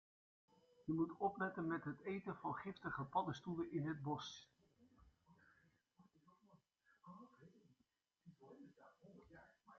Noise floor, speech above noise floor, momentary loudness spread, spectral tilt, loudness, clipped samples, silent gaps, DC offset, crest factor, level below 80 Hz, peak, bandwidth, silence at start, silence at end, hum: -86 dBFS; 41 dB; 22 LU; -5.5 dB/octave; -46 LUFS; under 0.1%; none; under 0.1%; 22 dB; -80 dBFS; -28 dBFS; 7.2 kHz; 0.8 s; 0 s; none